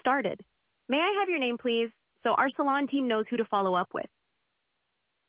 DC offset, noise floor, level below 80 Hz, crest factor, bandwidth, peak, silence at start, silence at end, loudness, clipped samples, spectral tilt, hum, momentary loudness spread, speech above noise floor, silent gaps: under 0.1%; -79 dBFS; -78 dBFS; 16 dB; 4 kHz; -12 dBFS; 0.05 s; 1.2 s; -29 LUFS; under 0.1%; -2 dB/octave; none; 9 LU; 51 dB; none